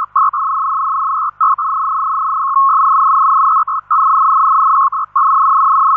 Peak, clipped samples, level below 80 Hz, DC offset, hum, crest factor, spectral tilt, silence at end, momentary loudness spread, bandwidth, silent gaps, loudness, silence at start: -4 dBFS; under 0.1%; -64 dBFS; under 0.1%; 50 Hz at -60 dBFS; 8 dB; -5.5 dB/octave; 0 s; 5 LU; 2.1 kHz; none; -12 LUFS; 0 s